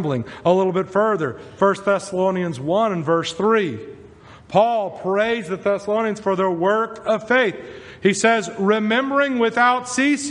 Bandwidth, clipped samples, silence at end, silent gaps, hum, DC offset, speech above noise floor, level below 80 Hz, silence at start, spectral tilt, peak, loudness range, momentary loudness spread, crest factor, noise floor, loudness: 10.5 kHz; under 0.1%; 0 s; none; none; under 0.1%; 24 dB; -60 dBFS; 0 s; -5 dB/octave; -2 dBFS; 2 LU; 6 LU; 18 dB; -44 dBFS; -20 LUFS